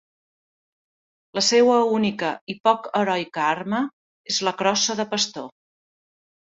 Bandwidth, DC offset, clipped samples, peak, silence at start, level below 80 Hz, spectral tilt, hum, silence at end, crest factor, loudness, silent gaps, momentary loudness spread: 8 kHz; under 0.1%; under 0.1%; -4 dBFS; 1.35 s; -68 dBFS; -3 dB/octave; none; 1.1 s; 20 dB; -22 LUFS; 2.41-2.47 s, 3.93-4.24 s; 12 LU